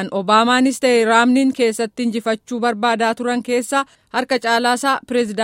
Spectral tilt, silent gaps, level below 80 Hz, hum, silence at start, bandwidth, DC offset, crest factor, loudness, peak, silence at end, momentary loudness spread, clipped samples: -3.5 dB/octave; none; -62 dBFS; none; 0 s; 16 kHz; under 0.1%; 16 dB; -17 LUFS; 0 dBFS; 0 s; 8 LU; under 0.1%